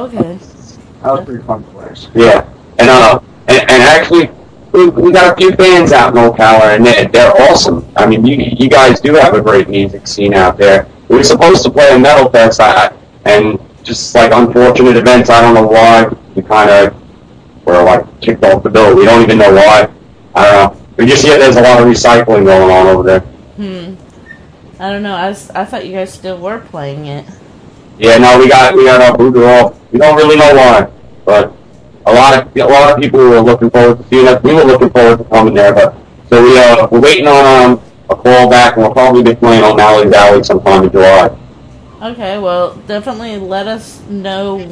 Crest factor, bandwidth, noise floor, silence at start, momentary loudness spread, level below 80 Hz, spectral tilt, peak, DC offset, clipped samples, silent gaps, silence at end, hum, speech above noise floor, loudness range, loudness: 6 dB; 11 kHz; -36 dBFS; 0 s; 15 LU; -34 dBFS; -5 dB/octave; 0 dBFS; under 0.1%; 8%; none; 0 s; none; 31 dB; 6 LU; -5 LUFS